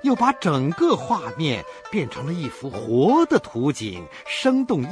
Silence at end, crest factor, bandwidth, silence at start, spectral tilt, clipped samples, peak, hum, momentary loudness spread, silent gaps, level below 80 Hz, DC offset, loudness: 0 s; 16 dB; 10.5 kHz; 0 s; -6 dB/octave; under 0.1%; -4 dBFS; none; 12 LU; none; -58 dBFS; under 0.1%; -22 LUFS